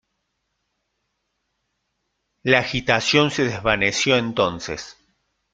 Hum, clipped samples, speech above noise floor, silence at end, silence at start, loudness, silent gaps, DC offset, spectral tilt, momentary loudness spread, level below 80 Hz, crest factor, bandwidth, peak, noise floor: none; under 0.1%; 55 dB; 0.6 s; 2.45 s; -19 LUFS; none; under 0.1%; -4 dB/octave; 13 LU; -50 dBFS; 22 dB; 9.4 kHz; 0 dBFS; -75 dBFS